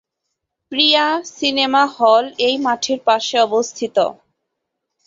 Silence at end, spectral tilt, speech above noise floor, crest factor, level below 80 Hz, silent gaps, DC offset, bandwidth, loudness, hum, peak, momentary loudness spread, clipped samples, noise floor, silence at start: 0.95 s; -2 dB/octave; 61 dB; 18 dB; -66 dBFS; none; under 0.1%; 7.8 kHz; -16 LUFS; none; 0 dBFS; 6 LU; under 0.1%; -77 dBFS; 0.7 s